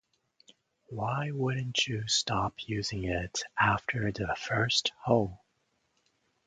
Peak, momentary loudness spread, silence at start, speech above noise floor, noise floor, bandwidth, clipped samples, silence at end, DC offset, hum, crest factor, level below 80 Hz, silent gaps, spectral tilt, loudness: -10 dBFS; 7 LU; 0.9 s; 45 dB; -76 dBFS; 9.6 kHz; under 0.1%; 1.1 s; under 0.1%; none; 22 dB; -54 dBFS; none; -4 dB/octave; -30 LUFS